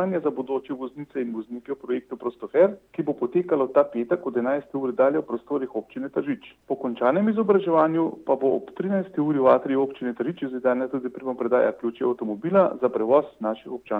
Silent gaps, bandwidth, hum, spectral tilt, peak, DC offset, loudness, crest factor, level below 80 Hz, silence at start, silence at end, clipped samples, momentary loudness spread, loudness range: none; 4.2 kHz; none; -9.5 dB/octave; -6 dBFS; under 0.1%; -24 LUFS; 18 dB; -70 dBFS; 0 s; 0 s; under 0.1%; 11 LU; 4 LU